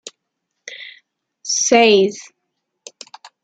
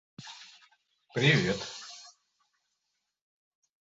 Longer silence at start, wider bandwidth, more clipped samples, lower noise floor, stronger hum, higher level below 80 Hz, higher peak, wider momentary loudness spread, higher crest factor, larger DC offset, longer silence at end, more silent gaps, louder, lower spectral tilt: first, 0.65 s vs 0.2 s; first, 9.2 kHz vs 8 kHz; neither; second, -76 dBFS vs -82 dBFS; neither; about the same, -66 dBFS vs -64 dBFS; first, -2 dBFS vs -10 dBFS; first, 27 LU vs 23 LU; second, 18 dB vs 24 dB; neither; second, 1.2 s vs 1.7 s; neither; first, -14 LUFS vs -28 LUFS; second, -2 dB/octave vs -5 dB/octave